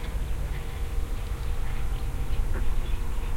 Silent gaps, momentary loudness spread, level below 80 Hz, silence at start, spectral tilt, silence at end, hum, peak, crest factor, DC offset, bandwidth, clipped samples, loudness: none; 3 LU; -28 dBFS; 0 s; -5.5 dB/octave; 0 s; none; -14 dBFS; 12 dB; under 0.1%; 16 kHz; under 0.1%; -34 LUFS